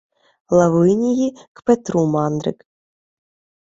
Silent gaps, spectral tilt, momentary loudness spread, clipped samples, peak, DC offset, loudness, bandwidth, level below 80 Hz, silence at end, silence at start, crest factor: 1.48-1.55 s; -7.5 dB/octave; 10 LU; under 0.1%; -2 dBFS; under 0.1%; -18 LUFS; 7.8 kHz; -56 dBFS; 1.15 s; 0.5 s; 18 dB